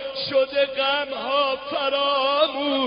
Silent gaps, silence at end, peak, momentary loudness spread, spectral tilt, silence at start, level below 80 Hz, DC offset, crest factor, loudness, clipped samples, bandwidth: none; 0 s; -6 dBFS; 4 LU; 0.5 dB/octave; 0 s; -62 dBFS; under 0.1%; 16 dB; -22 LUFS; under 0.1%; 5.4 kHz